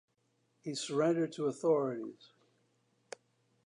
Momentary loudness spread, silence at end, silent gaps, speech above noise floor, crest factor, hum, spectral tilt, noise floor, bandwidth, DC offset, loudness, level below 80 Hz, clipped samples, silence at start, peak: 21 LU; 1.55 s; none; 44 dB; 18 dB; none; -5.5 dB/octave; -77 dBFS; 11 kHz; under 0.1%; -34 LUFS; under -90 dBFS; under 0.1%; 0.65 s; -18 dBFS